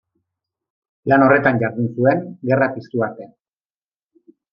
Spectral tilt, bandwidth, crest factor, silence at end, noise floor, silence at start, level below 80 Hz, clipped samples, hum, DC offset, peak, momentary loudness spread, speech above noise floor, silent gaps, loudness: -10.5 dB/octave; 5.6 kHz; 20 dB; 1.25 s; under -90 dBFS; 1.05 s; -60 dBFS; under 0.1%; none; under 0.1%; 0 dBFS; 12 LU; over 73 dB; none; -18 LUFS